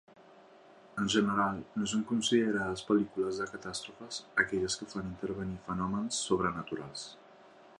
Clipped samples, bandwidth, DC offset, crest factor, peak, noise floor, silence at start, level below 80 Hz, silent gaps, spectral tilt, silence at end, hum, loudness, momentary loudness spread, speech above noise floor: under 0.1%; 11.5 kHz; under 0.1%; 22 dB; -12 dBFS; -57 dBFS; 0.2 s; -62 dBFS; none; -4 dB/octave; 0.05 s; none; -33 LUFS; 12 LU; 25 dB